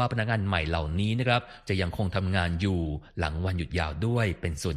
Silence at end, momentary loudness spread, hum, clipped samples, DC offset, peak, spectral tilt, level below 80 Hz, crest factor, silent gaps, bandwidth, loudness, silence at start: 0 s; 5 LU; none; under 0.1%; under 0.1%; -8 dBFS; -6 dB/octave; -40 dBFS; 20 dB; none; 13 kHz; -28 LUFS; 0 s